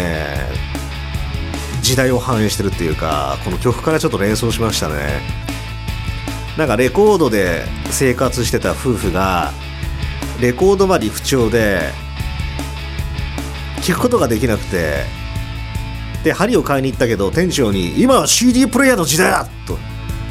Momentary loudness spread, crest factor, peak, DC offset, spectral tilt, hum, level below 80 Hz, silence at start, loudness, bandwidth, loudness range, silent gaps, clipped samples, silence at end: 13 LU; 16 dB; 0 dBFS; under 0.1%; -4.5 dB/octave; none; -28 dBFS; 0 s; -17 LUFS; 16.5 kHz; 5 LU; none; under 0.1%; 0 s